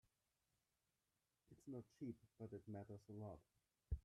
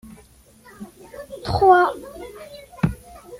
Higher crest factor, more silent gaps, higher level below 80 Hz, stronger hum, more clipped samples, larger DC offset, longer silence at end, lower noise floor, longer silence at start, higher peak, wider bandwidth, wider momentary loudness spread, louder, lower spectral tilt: about the same, 22 dB vs 20 dB; neither; second, -62 dBFS vs -44 dBFS; neither; neither; neither; about the same, 0.05 s vs 0.05 s; first, under -90 dBFS vs -51 dBFS; first, 1.5 s vs 0.8 s; second, -34 dBFS vs -4 dBFS; second, 12 kHz vs 16 kHz; second, 4 LU vs 26 LU; second, -57 LUFS vs -19 LUFS; first, -9 dB/octave vs -7 dB/octave